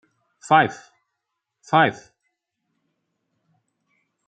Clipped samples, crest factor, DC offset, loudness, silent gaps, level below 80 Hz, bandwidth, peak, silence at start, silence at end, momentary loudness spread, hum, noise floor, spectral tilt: under 0.1%; 24 dB; under 0.1%; -19 LUFS; none; -72 dBFS; 9 kHz; -2 dBFS; 0.5 s; 2.35 s; 7 LU; none; -80 dBFS; -5 dB/octave